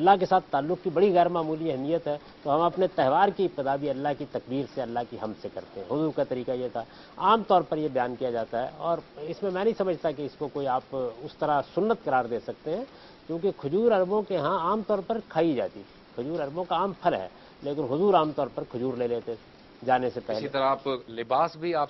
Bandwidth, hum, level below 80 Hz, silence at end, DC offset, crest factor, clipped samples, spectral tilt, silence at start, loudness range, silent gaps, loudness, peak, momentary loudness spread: 6 kHz; none; -62 dBFS; 0 s; under 0.1%; 20 dB; under 0.1%; -8 dB/octave; 0 s; 4 LU; none; -28 LUFS; -6 dBFS; 12 LU